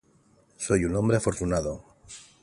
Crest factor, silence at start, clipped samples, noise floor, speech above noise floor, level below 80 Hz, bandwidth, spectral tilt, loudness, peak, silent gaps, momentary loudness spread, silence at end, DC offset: 20 dB; 0.6 s; under 0.1%; -62 dBFS; 37 dB; -44 dBFS; 11.5 kHz; -6 dB/octave; -27 LUFS; -8 dBFS; none; 21 LU; 0.2 s; under 0.1%